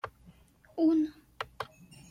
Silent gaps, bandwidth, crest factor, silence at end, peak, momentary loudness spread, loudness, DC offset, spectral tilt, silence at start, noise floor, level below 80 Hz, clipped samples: none; 10 kHz; 16 dB; 0.45 s; -18 dBFS; 17 LU; -31 LUFS; under 0.1%; -6 dB/octave; 0.05 s; -59 dBFS; -64 dBFS; under 0.1%